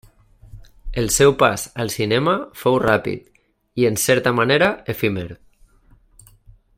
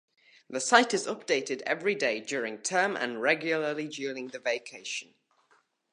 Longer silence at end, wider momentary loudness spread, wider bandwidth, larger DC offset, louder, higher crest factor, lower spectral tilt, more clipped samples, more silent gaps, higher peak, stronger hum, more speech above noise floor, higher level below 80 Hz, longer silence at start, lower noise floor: first, 1.45 s vs 0.9 s; about the same, 14 LU vs 13 LU; first, 16.5 kHz vs 11.5 kHz; neither; first, -18 LUFS vs -29 LUFS; second, 18 dB vs 26 dB; first, -4 dB/octave vs -2.5 dB/octave; neither; neither; about the same, -2 dBFS vs -4 dBFS; neither; second, 35 dB vs 39 dB; first, -42 dBFS vs -86 dBFS; about the same, 0.55 s vs 0.5 s; second, -53 dBFS vs -68 dBFS